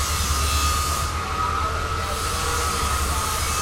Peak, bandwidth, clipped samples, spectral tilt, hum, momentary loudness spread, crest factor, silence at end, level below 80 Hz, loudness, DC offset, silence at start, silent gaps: -10 dBFS; 16.5 kHz; under 0.1%; -2.5 dB/octave; none; 4 LU; 14 dB; 0 s; -30 dBFS; -23 LUFS; under 0.1%; 0 s; none